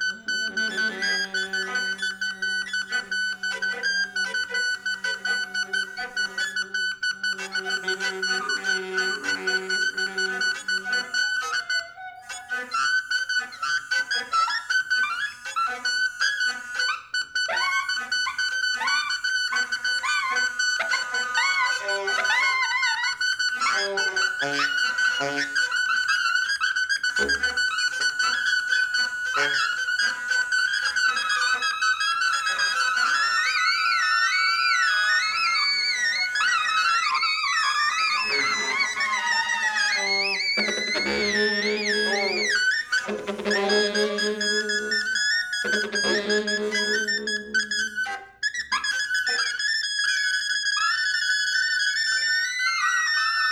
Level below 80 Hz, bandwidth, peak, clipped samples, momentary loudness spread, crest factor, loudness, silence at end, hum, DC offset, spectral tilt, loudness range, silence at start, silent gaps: -64 dBFS; 17.5 kHz; -8 dBFS; under 0.1%; 6 LU; 16 dB; -23 LUFS; 0 s; none; under 0.1%; 0 dB/octave; 5 LU; 0 s; none